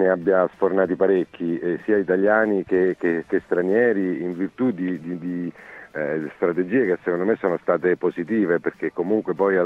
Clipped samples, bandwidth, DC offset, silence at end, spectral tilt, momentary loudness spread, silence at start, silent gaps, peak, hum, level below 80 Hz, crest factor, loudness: under 0.1%; 5.2 kHz; under 0.1%; 0 s; -9.5 dB/octave; 9 LU; 0 s; none; -4 dBFS; none; -64 dBFS; 18 dB; -22 LUFS